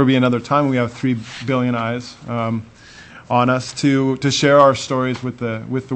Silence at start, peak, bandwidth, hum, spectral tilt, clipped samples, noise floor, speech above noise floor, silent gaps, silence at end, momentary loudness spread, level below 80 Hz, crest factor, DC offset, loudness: 0 s; 0 dBFS; 8.6 kHz; none; -5.5 dB/octave; under 0.1%; -41 dBFS; 24 dB; none; 0 s; 11 LU; -54 dBFS; 18 dB; under 0.1%; -18 LUFS